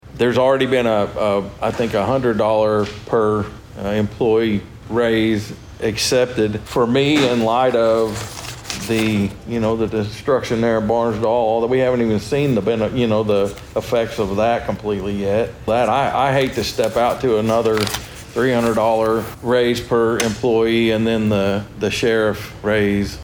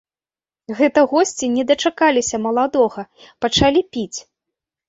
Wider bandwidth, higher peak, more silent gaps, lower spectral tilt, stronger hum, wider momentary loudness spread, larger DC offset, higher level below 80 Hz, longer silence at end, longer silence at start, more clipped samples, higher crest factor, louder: first, over 20 kHz vs 8 kHz; about the same, -2 dBFS vs -2 dBFS; neither; first, -5.5 dB/octave vs -3.5 dB/octave; neither; second, 7 LU vs 15 LU; neither; about the same, -42 dBFS vs -44 dBFS; second, 0 s vs 0.65 s; second, 0.05 s vs 0.7 s; neither; about the same, 16 dB vs 16 dB; about the same, -18 LUFS vs -17 LUFS